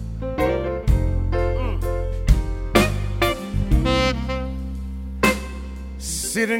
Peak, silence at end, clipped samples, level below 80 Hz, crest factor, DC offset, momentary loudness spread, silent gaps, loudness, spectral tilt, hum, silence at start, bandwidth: 0 dBFS; 0 s; under 0.1%; -24 dBFS; 20 dB; under 0.1%; 12 LU; none; -23 LUFS; -5 dB/octave; none; 0 s; 16.5 kHz